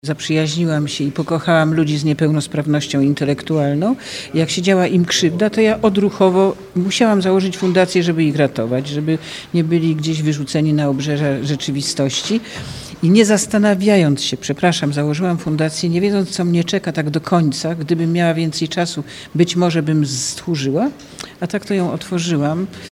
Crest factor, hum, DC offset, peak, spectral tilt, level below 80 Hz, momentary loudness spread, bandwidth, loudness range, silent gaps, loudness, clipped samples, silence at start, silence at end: 16 dB; none; under 0.1%; 0 dBFS; -5.5 dB/octave; -52 dBFS; 7 LU; 14.5 kHz; 3 LU; none; -17 LUFS; under 0.1%; 0.05 s; 0.05 s